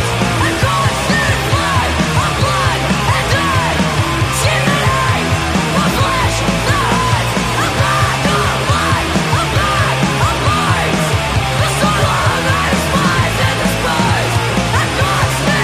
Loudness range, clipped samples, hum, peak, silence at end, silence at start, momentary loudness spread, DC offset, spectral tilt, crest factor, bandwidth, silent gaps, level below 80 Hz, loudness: 0 LU; under 0.1%; none; 0 dBFS; 0 s; 0 s; 2 LU; under 0.1%; -4.5 dB/octave; 12 dB; 15.5 kHz; none; -28 dBFS; -14 LUFS